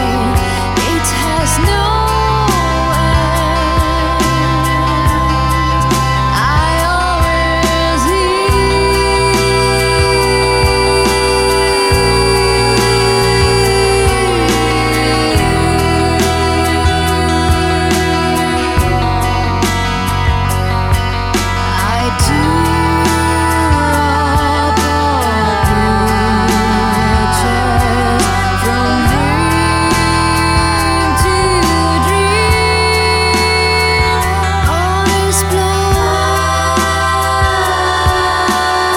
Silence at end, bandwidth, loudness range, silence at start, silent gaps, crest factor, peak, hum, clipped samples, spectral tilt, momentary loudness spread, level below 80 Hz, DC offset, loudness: 0 s; 17 kHz; 2 LU; 0 s; none; 12 dB; 0 dBFS; none; under 0.1%; -4.5 dB/octave; 3 LU; -20 dBFS; under 0.1%; -12 LUFS